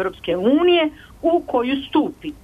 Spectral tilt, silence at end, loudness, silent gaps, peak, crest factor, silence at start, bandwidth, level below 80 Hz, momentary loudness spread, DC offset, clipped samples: -6.5 dB/octave; 0.1 s; -19 LUFS; none; -6 dBFS; 12 dB; 0 s; 5 kHz; -50 dBFS; 9 LU; under 0.1%; under 0.1%